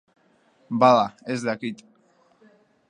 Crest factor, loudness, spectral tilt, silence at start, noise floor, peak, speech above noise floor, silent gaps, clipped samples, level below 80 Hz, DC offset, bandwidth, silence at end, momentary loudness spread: 22 dB; -22 LUFS; -6 dB/octave; 0.7 s; -62 dBFS; -4 dBFS; 40 dB; none; under 0.1%; -72 dBFS; under 0.1%; 10.5 kHz; 1.15 s; 16 LU